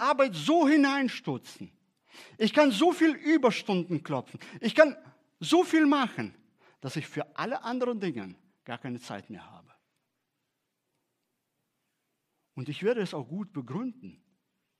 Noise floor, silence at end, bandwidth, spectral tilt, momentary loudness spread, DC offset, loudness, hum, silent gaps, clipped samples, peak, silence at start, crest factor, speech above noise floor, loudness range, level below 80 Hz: -82 dBFS; 0.7 s; 13.5 kHz; -5.5 dB/octave; 19 LU; under 0.1%; -27 LUFS; none; none; under 0.1%; -4 dBFS; 0 s; 26 dB; 54 dB; 15 LU; -84 dBFS